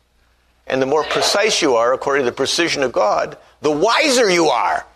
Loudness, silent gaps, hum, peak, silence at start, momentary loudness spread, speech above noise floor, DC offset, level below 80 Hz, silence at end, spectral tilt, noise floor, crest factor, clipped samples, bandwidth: -16 LUFS; none; none; -2 dBFS; 0.65 s; 8 LU; 41 dB; under 0.1%; -54 dBFS; 0.1 s; -2.5 dB/octave; -58 dBFS; 14 dB; under 0.1%; 13.5 kHz